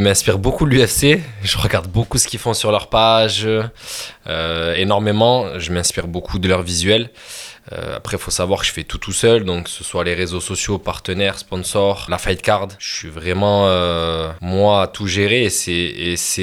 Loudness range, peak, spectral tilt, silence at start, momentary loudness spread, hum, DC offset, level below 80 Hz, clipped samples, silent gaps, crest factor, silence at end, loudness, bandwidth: 4 LU; 0 dBFS; -4 dB/octave; 0 s; 11 LU; none; under 0.1%; -36 dBFS; under 0.1%; none; 18 dB; 0 s; -17 LUFS; 17.5 kHz